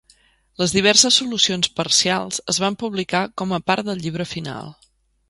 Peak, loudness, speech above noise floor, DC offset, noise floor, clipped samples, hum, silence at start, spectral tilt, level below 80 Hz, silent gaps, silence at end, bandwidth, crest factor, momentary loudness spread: 0 dBFS; -18 LUFS; 37 dB; under 0.1%; -57 dBFS; under 0.1%; none; 0.6 s; -2.5 dB/octave; -54 dBFS; none; 0.55 s; 11.5 kHz; 22 dB; 14 LU